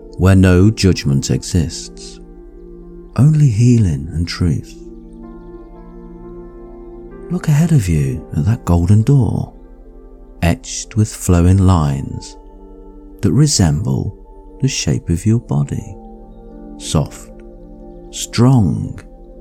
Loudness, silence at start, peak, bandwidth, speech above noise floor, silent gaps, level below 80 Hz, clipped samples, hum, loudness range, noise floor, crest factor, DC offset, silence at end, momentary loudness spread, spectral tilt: -15 LUFS; 0 s; 0 dBFS; 14.5 kHz; 24 dB; none; -32 dBFS; under 0.1%; none; 5 LU; -37 dBFS; 14 dB; under 0.1%; 0 s; 24 LU; -6 dB/octave